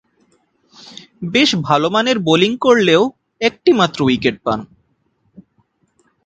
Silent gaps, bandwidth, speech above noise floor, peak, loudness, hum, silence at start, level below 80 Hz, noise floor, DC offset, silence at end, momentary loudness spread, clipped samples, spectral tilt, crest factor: none; 9.2 kHz; 49 dB; 0 dBFS; -15 LUFS; none; 0.85 s; -54 dBFS; -63 dBFS; under 0.1%; 1.6 s; 12 LU; under 0.1%; -5 dB/octave; 18 dB